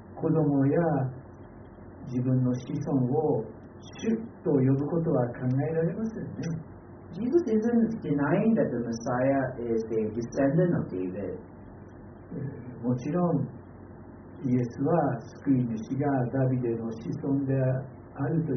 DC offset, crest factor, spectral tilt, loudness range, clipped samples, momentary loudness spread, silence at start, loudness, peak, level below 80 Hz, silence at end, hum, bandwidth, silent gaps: under 0.1%; 16 dB; -9.5 dB/octave; 4 LU; under 0.1%; 21 LU; 0 s; -28 LUFS; -12 dBFS; -58 dBFS; 0 s; none; 6.4 kHz; none